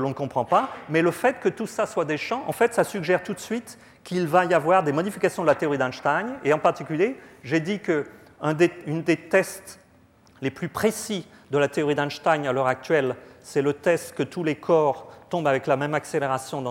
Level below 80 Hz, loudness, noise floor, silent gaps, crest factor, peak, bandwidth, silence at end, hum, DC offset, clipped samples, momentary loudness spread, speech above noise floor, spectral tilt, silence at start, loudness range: -66 dBFS; -24 LUFS; -56 dBFS; none; 18 dB; -6 dBFS; 16.5 kHz; 0 s; none; under 0.1%; under 0.1%; 10 LU; 32 dB; -5.5 dB/octave; 0 s; 3 LU